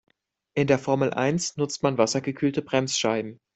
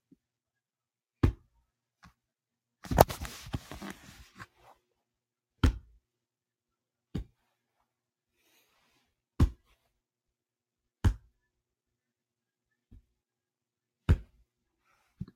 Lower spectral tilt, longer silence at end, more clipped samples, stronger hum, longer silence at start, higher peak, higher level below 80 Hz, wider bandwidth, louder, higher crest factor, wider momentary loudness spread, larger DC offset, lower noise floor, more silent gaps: second, -4.5 dB/octave vs -6.5 dB/octave; about the same, 0.2 s vs 0.1 s; neither; neither; second, 0.55 s vs 1.25 s; second, -6 dBFS vs 0 dBFS; second, -62 dBFS vs -42 dBFS; second, 8.4 kHz vs 16.5 kHz; first, -25 LUFS vs -32 LUFS; second, 20 dB vs 36 dB; second, 5 LU vs 26 LU; neither; second, -54 dBFS vs under -90 dBFS; neither